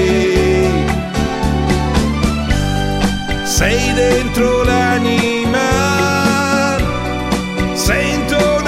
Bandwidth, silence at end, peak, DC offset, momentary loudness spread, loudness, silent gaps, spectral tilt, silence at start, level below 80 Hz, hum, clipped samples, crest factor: 16.5 kHz; 0 s; -2 dBFS; under 0.1%; 5 LU; -15 LUFS; none; -5 dB/octave; 0 s; -24 dBFS; none; under 0.1%; 12 dB